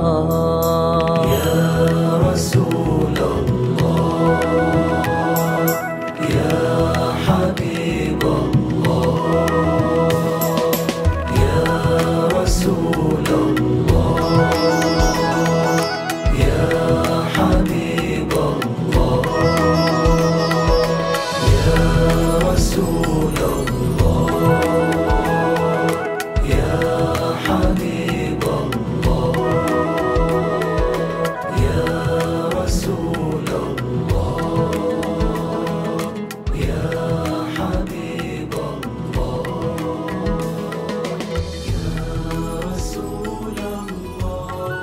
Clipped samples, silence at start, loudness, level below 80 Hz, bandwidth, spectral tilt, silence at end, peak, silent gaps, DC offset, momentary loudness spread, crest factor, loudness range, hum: under 0.1%; 0 s; -18 LUFS; -28 dBFS; 16.5 kHz; -6 dB/octave; 0 s; -2 dBFS; none; under 0.1%; 8 LU; 16 dB; 7 LU; none